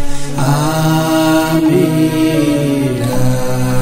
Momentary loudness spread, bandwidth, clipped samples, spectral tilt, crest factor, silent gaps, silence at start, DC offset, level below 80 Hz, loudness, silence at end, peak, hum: 4 LU; 16.5 kHz; under 0.1%; -6 dB/octave; 10 dB; none; 0 s; under 0.1%; -28 dBFS; -13 LUFS; 0 s; -2 dBFS; none